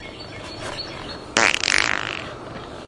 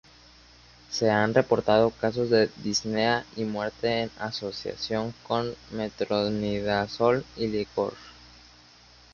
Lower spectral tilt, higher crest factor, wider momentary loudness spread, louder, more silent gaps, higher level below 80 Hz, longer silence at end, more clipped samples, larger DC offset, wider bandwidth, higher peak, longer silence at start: second, -1.5 dB/octave vs -5 dB/octave; about the same, 24 dB vs 20 dB; first, 18 LU vs 10 LU; first, -21 LUFS vs -27 LUFS; neither; first, -48 dBFS vs -56 dBFS; second, 0 s vs 1 s; neither; neither; first, 11.5 kHz vs 7.2 kHz; first, 0 dBFS vs -6 dBFS; second, 0 s vs 0.9 s